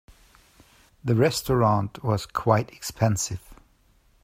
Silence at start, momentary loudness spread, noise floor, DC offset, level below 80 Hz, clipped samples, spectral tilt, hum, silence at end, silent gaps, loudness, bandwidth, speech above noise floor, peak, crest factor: 1.05 s; 11 LU; -61 dBFS; under 0.1%; -50 dBFS; under 0.1%; -5.5 dB/octave; none; 0.7 s; none; -24 LUFS; 16 kHz; 38 dB; -4 dBFS; 22 dB